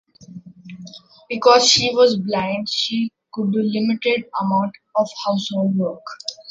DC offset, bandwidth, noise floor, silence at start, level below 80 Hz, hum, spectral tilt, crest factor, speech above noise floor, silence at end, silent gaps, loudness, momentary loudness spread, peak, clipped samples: under 0.1%; 8 kHz; -40 dBFS; 0.2 s; -62 dBFS; none; -4 dB/octave; 18 dB; 21 dB; 0 s; none; -19 LUFS; 17 LU; -2 dBFS; under 0.1%